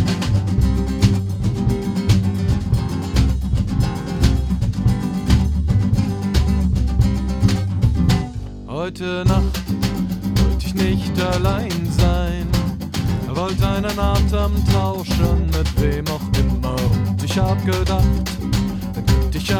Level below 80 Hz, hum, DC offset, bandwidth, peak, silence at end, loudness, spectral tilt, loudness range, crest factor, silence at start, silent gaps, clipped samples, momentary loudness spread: -24 dBFS; none; under 0.1%; 17.5 kHz; 0 dBFS; 0 s; -19 LUFS; -6.5 dB/octave; 1 LU; 18 dB; 0 s; none; under 0.1%; 4 LU